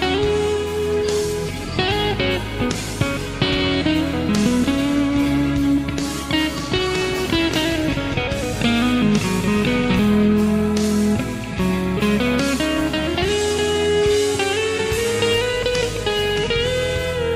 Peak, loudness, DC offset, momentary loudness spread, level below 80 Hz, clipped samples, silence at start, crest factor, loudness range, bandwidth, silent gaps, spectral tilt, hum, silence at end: -2 dBFS; -19 LUFS; under 0.1%; 5 LU; -34 dBFS; under 0.1%; 0 s; 16 dB; 2 LU; 16 kHz; none; -5 dB/octave; none; 0 s